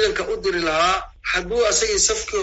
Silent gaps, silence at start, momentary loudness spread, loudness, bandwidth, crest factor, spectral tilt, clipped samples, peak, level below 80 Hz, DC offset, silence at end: none; 0 s; 6 LU; -20 LUFS; 8.2 kHz; 16 dB; -1 dB/octave; under 0.1%; -4 dBFS; -40 dBFS; under 0.1%; 0 s